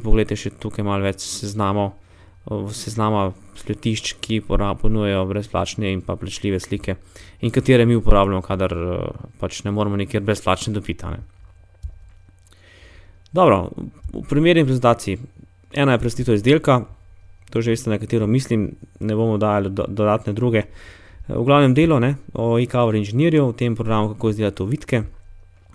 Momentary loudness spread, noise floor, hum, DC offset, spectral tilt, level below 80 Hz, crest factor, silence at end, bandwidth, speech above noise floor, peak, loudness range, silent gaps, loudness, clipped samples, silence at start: 14 LU; -49 dBFS; none; under 0.1%; -6.5 dB/octave; -32 dBFS; 20 dB; 0.35 s; 11 kHz; 30 dB; 0 dBFS; 6 LU; none; -20 LUFS; under 0.1%; 0 s